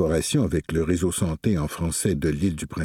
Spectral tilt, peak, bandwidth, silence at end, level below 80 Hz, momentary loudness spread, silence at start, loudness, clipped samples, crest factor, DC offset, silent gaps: -5.5 dB/octave; -8 dBFS; 17 kHz; 0 s; -38 dBFS; 3 LU; 0 s; -24 LUFS; under 0.1%; 14 dB; under 0.1%; none